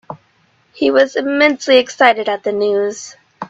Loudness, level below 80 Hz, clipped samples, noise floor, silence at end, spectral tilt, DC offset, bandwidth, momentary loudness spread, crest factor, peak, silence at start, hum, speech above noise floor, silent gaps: -14 LUFS; -62 dBFS; under 0.1%; -57 dBFS; 0.05 s; -3 dB/octave; under 0.1%; 8 kHz; 20 LU; 16 dB; 0 dBFS; 0.1 s; none; 43 dB; none